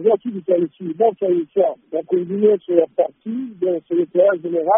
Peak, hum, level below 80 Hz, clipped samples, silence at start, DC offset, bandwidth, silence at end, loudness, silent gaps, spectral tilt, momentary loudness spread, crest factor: -2 dBFS; none; -70 dBFS; under 0.1%; 0 s; under 0.1%; 3.6 kHz; 0 s; -19 LUFS; none; -4.5 dB/octave; 7 LU; 16 dB